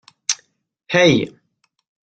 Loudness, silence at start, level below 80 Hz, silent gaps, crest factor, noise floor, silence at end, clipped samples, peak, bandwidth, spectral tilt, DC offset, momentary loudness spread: -18 LUFS; 0.3 s; -58 dBFS; none; 20 dB; -61 dBFS; 0.9 s; under 0.1%; -2 dBFS; 9.4 kHz; -4 dB/octave; under 0.1%; 12 LU